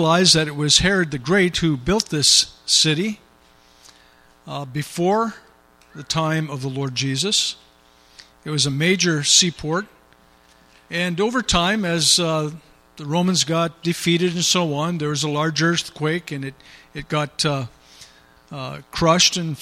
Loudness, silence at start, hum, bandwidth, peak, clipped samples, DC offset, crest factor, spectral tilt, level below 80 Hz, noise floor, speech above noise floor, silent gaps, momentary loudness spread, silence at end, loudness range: -19 LUFS; 0 s; none; 15.5 kHz; 0 dBFS; under 0.1%; under 0.1%; 22 dB; -3 dB/octave; -46 dBFS; -53 dBFS; 33 dB; none; 16 LU; 0 s; 7 LU